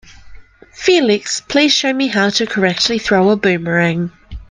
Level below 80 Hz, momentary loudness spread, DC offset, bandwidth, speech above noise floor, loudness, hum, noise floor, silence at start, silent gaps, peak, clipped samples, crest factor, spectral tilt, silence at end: -42 dBFS; 5 LU; under 0.1%; 10 kHz; 22 dB; -14 LUFS; none; -36 dBFS; 0.25 s; none; 0 dBFS; under 0.1%; 16 dB; -4 dB/octave; 0.05 s